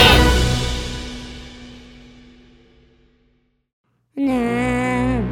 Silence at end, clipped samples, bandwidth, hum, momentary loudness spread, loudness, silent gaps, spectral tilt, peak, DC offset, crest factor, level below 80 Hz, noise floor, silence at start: 0 s; under 0.1%; 16.5 kHz; none; 23 LU; -19 LUFS; 3.73-3.84 s; -4.5 dB/octave; 0 dBFS; under 0.1%; 20 dB; -26 dBFS; -63 dBFS; 0 s